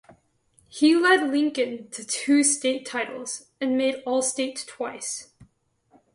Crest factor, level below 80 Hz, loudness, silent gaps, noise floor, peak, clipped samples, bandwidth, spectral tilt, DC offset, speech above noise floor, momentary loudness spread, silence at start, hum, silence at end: 18 dB; -72 dBFS; -24 LUFS; none; -64 dBFS; -6 dBFS; under 0.1%; 11.5 kHz; -1.5 dB/octave; under 0.1%; 41 dB; 14 LU; 0.75 s; none; 0.7 s